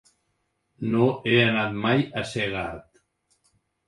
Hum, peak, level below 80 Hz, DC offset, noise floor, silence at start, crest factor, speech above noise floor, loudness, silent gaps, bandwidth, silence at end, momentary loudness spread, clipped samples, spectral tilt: none; -4 dBFS; -56 dBFS; under 0.1%; -74 dBFS; 0.8 s; 22 dB; 51 dB; -24 LUFS; none; 11.5 kHz; 1.05 s; 13 LU; under 0.1%; -6.5 dB/octave